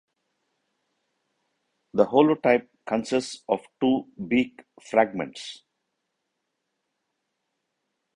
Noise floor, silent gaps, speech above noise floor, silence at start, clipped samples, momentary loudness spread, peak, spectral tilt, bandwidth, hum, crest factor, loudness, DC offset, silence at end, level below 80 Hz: -80 dBFS; none; 56 dB; 1.95 s; under 0.1%; 13 LU; -4 dBFS; -5.5 dB/octave; 10.5 kHz; none; 24 dB; -25 LUFS; under 0.1%; 2.6 s; -66 dBFS